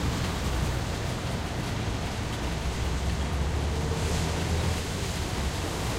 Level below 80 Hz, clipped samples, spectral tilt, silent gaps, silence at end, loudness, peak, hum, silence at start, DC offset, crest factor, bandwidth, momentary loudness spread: -34 dBFS; under 0.1%; -5 dB/octave; none; 0 s; -30 LUFS; -14 dBFS; none; 0 s; under 0.1%; 14 dB; 16 kHz; 3 LU